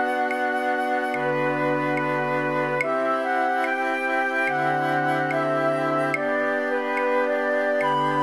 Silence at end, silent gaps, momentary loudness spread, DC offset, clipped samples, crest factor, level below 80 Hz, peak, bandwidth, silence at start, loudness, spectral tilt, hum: 0 s; none; 2 LU; 0.1%; under 0.1%; 14 dB; -76 dBFS; -10 dBFS; 14 kHz; 0 s; -23 LUFS; -6 dB/octave; none